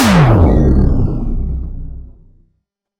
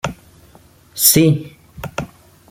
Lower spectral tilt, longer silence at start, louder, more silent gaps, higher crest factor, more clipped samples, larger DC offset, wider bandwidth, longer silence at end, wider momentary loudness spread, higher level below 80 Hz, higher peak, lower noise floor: first, -7 dB/octave vs -4 dB/octave; about the same, 0 s vs 0.05 s; about the same, -13 LUFS vs -13 LUFS; neither; second, 12 dB vs 20 dB; neither; neither; about the same, 16 kHz vs 17 kHz; first, 0.95 s vs 0.45 s; second, 20 LU vs 24 LU; first, -18 dBFS vs -46 dBFS; about the same, 0 dBFS vs 0 dBFS; first, -67 dBFS vs -48 dBFS